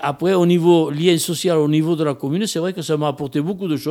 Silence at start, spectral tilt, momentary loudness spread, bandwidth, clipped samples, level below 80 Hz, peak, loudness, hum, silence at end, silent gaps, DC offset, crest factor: 0 s; -6 dB/octave; 8 LU; 17 kHz; under 0.1%; -62 dBFS; -2 dBFS; -18 LUFS; none; 0 s; none; under 0.1%; 14 dB